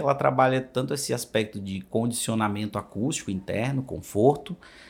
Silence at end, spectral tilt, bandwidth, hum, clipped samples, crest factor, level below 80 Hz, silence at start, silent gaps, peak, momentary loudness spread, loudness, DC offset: 0 s; -5 dB/octave; 17 kHz; none; under 0.1%; 20 dB; -60 dBFS; 0 s; none; -6 dBFS; 9 LU; -26 LUFS; under 0.1%